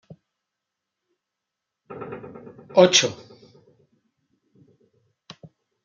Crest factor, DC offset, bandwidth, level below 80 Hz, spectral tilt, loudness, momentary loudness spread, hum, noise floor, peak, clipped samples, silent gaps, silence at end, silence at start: 26 dB; under 0.1%; 9 kHz; -70 dBFS; -3 dB/octave; -18 LUFS; 28 LU; none; -84 dBFS; -2 dBFS; under 0.1%; none; 2.7 s; 1.9 s